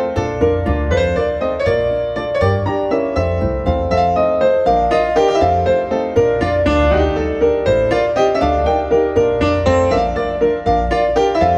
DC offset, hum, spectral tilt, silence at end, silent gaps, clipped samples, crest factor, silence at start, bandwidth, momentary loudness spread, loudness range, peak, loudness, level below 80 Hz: under 0.1%; none; -7 dB/octave; 0 s; none; under 0.1%; 14 dB; 0 s; 9 kHz; 4 LU; 2 LU; -2 dBFS; -16 LUFS; -28 dBFS